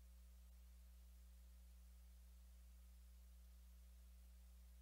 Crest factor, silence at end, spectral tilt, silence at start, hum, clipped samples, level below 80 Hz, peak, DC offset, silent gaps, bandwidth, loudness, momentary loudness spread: 6 dB; 0 s; -4.5 dB/octave; 0 s; none; under 0.1%; -64 dBFS; -56 dBFS; under 0.1%; none; 16 kHz; -67 LUFS; 0 LU